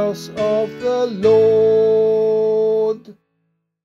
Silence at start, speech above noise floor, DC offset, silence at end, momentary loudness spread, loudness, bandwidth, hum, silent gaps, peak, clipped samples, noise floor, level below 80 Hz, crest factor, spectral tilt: 0 s; 54 dB; under 0.1%; 0.7 s; 9 LU; -16 LUFS; 7.4 kHz; none; none; -4 dBFS; under 0.1%; -70 dBFS; -58 dBFS; 12 dB; -6.5 dB/octave